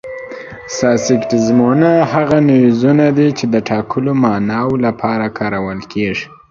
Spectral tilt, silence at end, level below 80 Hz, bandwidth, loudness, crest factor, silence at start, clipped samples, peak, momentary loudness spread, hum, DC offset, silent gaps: -6.5 dB/octave; 0.25 s; -48 dBFS; 7.6 kHz; -14 LUFS; 14 dB; 0.05 s; under 0.1%; 0 dBFS; 11 LU; none; under 0.1%; none